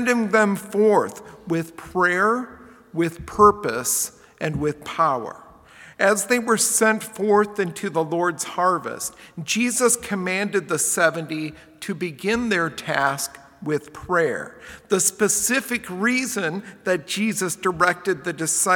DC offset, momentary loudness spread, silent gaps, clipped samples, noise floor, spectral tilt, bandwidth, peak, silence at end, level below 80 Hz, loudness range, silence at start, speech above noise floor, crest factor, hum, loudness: under 0.1%; 11 LU; none; under 0.1%; -47 dBFS; -3.5 dB/octave; 18 kHz; -2 dBFS; 0 s; -54 dBFS; 2 LU; 0 s; 25 dB; 20 dB; none; -22 LUFS